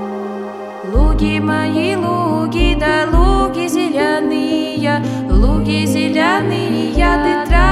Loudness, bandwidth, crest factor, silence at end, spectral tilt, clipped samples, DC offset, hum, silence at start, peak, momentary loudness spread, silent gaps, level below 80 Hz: -15 LUFS; 13.5 kHz; 14 dB; 0 s; -6 dB/octave; under 0.1%; under 0.1%; none; 0 s; 0 dBFS; 4 LU; none; -20 dBFS